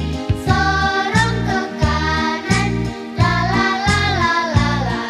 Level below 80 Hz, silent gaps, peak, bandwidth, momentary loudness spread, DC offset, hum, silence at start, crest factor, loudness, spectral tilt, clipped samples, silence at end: -28 dBFS; none; -2 dBFS; 12.5 kHz; 5 LU; under 0.1%; none; 0 s; 16 dB; -17 LUFS; -5 dB/octave; under 0.1%; 0 s